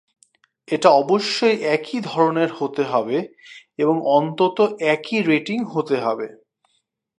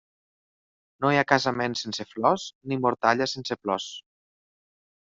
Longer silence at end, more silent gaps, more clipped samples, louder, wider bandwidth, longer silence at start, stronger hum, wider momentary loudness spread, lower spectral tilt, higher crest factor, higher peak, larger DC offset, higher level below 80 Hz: second, 0.9 s vs 1.15 s; second, none vs 2.55-2.61 s; neither; first, -20 LUFS vs -25 LUFS; first, 11 kHz vs 7.8 kHz; second, 0.7 s vs 1 s; neither; about the same, 9 LU vs 9 LU; about the same, -5.5 dB/octave vs -4.5 dB/octave; about the same, 20 dB vs 24 dB; about the same, 0 dBFS vs -2 dBFS; neither; second, -74 dBFS vs -66 dBFS